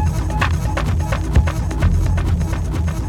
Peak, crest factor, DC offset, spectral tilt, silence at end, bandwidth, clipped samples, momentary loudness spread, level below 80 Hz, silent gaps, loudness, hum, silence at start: -2 dBFS; 14 dB; under 0.1%; -6.5 dB/octave; 0 s; 14.5 kHz; under 0.1%; 3 LU; -20 dBFS; none; -19 LUFS; none; 0 s